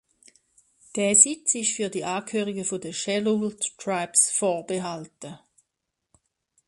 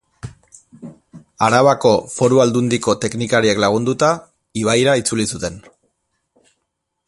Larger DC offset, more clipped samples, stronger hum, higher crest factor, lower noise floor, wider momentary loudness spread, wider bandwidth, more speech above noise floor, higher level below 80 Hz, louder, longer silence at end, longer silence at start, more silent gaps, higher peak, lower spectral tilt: neither; neither; neither; first, 26 dB vs 18 dB; first, -82 dBFS vs -74 dBFS; first, 18 LU vs 14 LU; about the same, 11.5 kHz vs 11.5 kHz; about the same, 56 dB vs 59 dB; second, -70 dBFS vs -50 dBFS; second, -23 LUFS vs -16 LUFS; second, 1.3 s vs 1.5 s; first, 0.95 s vs 0.25 s; neither; about the same, 0 dBFS vs 0 dBFS; second, -2.5 dB/octave vs -4.5 dB/octave